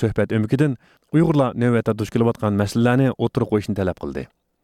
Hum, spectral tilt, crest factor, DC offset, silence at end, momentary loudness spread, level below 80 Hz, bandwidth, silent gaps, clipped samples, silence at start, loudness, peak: none; -8 dB/octave; 14 dB; under 0.1%; 0.4 s; 11 LU; -48 dBFS; 14.5 kHz; none; under 0.1%; 0 s; -20 LUFS; -6 dBFS